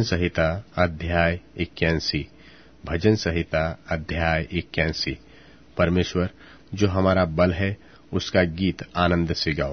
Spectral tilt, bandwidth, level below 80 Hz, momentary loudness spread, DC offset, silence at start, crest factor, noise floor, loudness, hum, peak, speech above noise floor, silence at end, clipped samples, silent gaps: -6 dB/octave; 6.6 kHz; -40 dBFS; 9 LU; 0.2%; 0 s; 20 dB; -50 dBFS; -24 LUFS; none; -4 dBFS; 27 dB; 0 s; under 0.1%; none